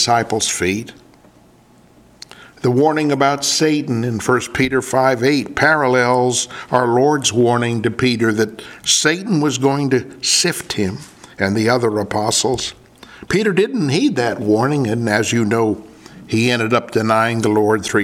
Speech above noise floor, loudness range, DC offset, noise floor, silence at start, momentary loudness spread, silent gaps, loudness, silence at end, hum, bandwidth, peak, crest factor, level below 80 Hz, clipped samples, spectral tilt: 33 dB; 3 LU; under 0.1%; -49 dBFS; 0 s; 6 LU; none; -16 LUFS; 0 s; none; 16.5 kHz; 0 dBFS; 16 dB; -50 dBFS; under 0.1%; -4 dB/octave